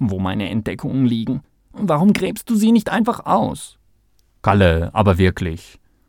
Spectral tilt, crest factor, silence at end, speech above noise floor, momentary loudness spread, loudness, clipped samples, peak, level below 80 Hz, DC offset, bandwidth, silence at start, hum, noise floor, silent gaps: -7 dB/octave; 18 dB; 0.45 s; 41 dB; 11 LU; -18 LUFS; under 0.1%; 0 dBFS; -38 dBFS; under 0.1%; 17 kHz; 0 s; none; -58 dBFS; none